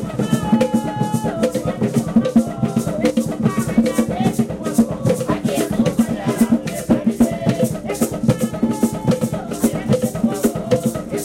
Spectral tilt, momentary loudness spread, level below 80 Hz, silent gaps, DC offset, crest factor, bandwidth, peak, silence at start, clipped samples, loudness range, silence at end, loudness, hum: -6.5 dB/octave; 4 LU; -42 dBFS; none; under 0.1%; 14 dB; 16.5 kHz; -4 dBFS; 0 s; under 0.1%; 1 LU; 0 s; -19 LUFS; none